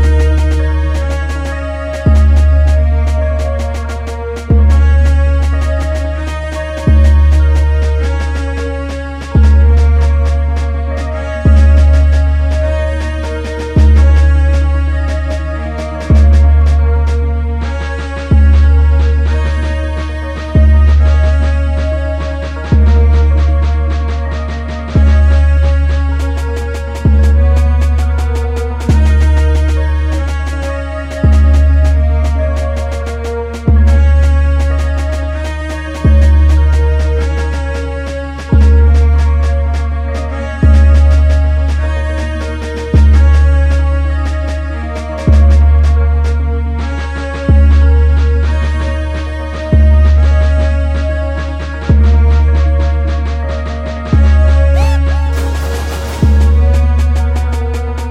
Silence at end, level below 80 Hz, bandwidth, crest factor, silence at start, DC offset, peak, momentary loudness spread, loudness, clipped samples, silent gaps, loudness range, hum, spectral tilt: 0 s; -10 dBFS; 7.2 kHz; 10 dB; 0 s; under 0.1%; 0 dBFS; 11 LU; -12 LUFS; under 0.1%; none; 2 LU; none; -7.5 dB/octave